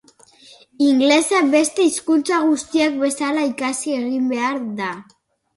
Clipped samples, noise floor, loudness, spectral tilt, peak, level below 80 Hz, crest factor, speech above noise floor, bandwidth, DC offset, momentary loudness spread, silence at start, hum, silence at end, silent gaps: under 0.1%; -49 dBFS; -18 LUFS; -2.5 dB/octave; -2 dBFS; -66 dBFS; 18 dB; 31 dB; 11.5 kHz; under 0.1%; 9 LU; 0.8 s; none; 0.55 s; none